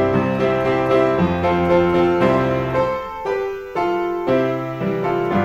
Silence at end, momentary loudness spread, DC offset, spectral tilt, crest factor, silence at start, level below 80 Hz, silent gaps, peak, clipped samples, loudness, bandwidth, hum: 0 s; 7 LU; under 0.1%; -8 dB/octave; 16 dB; 0 s; -44 dBFS; none; -2 dBFS; under 0.1%; -19 LUFS; 15 kHz; none